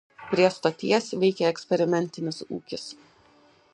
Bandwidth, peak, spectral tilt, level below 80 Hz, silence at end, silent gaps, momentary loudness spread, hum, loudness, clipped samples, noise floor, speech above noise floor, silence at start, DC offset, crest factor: 10 kHz; -6 dBFS; -5.5 dB/octave; -70 dBFS; 0.8 s; none; 13 LU; none; -25 LUFS; under 0.1%; -59 dBFS; 34 dB; 0.2 s; under 0.1%; 20 dB